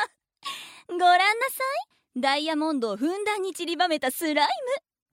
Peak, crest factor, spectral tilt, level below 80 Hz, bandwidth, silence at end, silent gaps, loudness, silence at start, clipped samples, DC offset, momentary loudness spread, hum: -8 dBFS; 18 dB; -2 dB/octave; -78 dBFS; 17 kHz; 0.35 s; none; -25 LUFS; 0 s; under 0.1%; under 0.1%; 15 LU; none